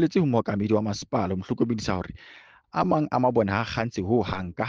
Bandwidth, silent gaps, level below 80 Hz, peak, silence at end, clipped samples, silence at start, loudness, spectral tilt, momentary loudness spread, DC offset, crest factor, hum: 7.6 kHz; none; -52 dBFS; -8 dBFS; 0 s; under 0.1%; 0 s; -26 LUFS; -7 dB/octave; 8 LU; under 0.1%; 18 dB; none